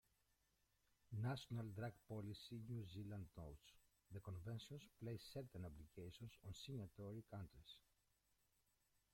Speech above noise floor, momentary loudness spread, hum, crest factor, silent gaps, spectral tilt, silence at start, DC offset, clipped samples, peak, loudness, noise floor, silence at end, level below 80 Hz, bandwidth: 31 dB; 10 LU; none; 20 dB; none; -6.5 dB/octave; 1.1 s; under 0.1%; under 0.1%; -36 dBFS; -54 LUFS; -85 dBFS; 1.35 s; -74 dBFS; 16.5 kHz